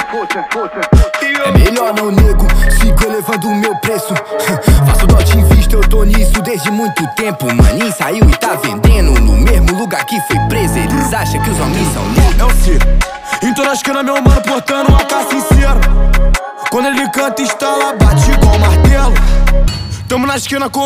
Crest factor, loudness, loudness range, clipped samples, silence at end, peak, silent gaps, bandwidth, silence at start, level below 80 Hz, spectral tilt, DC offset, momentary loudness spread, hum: 10 dB; -12 LUFS; 2 LU; under 0.1%; 0 s; 0 dBFS; none; 16 kHz; 0 s; -12 dBFS; -5.5 dB/octave; under 0.1%; 6 LU; none